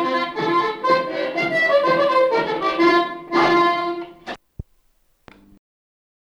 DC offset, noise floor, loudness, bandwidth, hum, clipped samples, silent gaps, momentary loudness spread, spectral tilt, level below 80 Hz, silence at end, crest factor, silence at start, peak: under 0.1%; -61 dBFS; -18 LUFS; 11 kHz; none; under 0.1%; none; 13 LU; -5 dB/octave; -52 dBFS; 1.7 s; 16 dB; 0 s; -4 dBFS